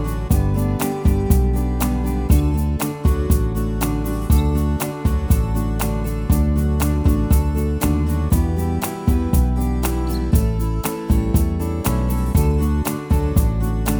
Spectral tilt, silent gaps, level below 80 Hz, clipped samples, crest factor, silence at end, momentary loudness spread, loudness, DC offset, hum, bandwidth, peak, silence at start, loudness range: -7 dB/octave; none; -20 dBFS; under 0.1%; 16 dB; 0 s; 4 LU; -20 LUFS; under 0.1%; none; over 20 kHz; -2 dBFS; 0 s; 1 LU